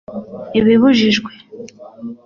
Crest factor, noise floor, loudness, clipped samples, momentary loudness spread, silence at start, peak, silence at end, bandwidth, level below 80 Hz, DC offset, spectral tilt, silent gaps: 14 dB; -35 dBFS; -13 LUFS; under 0.1%; 24 LU; 0.1 s; -2 dBFS; 0.1 s; 7.2 kHz; -50 dBFS; under 0.1%; -5.5 dB/octave; none